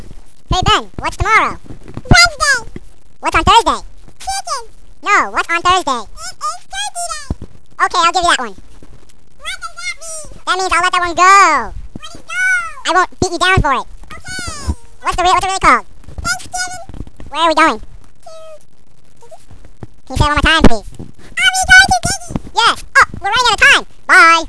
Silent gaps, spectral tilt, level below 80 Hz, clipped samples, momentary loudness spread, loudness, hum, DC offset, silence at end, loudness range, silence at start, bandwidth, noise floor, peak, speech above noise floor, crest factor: none; -2.5 dB/octave; -28 dBFS; 0.5%; 18 LU; -12 LUFS; none; 4%; 0 s; 7 LU; 0 s; 11 kHz; -38 dBFS; 0 dBFS; 26 dB; 14 dB